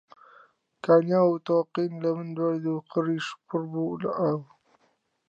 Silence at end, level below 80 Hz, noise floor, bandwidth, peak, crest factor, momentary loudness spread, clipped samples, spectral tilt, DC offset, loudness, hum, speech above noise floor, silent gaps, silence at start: 0.85 s; -76 dBFS; -70 dBFS; 8 kHz; -8 dBFS; 18 dB; 10 LU; under 0.1%; -8 dB/octave; under 0.1%; -27 LUFS; none; 45 dB; none; 0.85 s